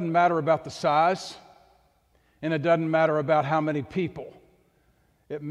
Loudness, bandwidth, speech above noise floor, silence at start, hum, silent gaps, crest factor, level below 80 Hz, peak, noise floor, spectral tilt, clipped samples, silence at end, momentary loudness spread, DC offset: -25 LUFS; 11.5 kHz; 41 dB; 0 s; none; none; 16 dB; -64 dBFS; -10 dBFS; -65 dBFS; -6.5 dB/octave; under 0.1%; 0 s; 17 LU; under 0.1%